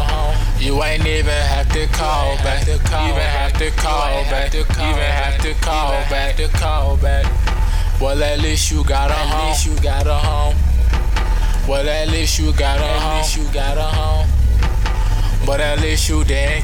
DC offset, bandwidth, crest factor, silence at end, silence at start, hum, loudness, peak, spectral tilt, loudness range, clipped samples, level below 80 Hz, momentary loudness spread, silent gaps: under 0.1%; 17 kHz; 10 dB; 0 s; 0 s; none; -18 LUFS; -4 dBFS; -4.5 dB/octave; 1 LU; under 0.1%; -16 dBFS; 3 LU; none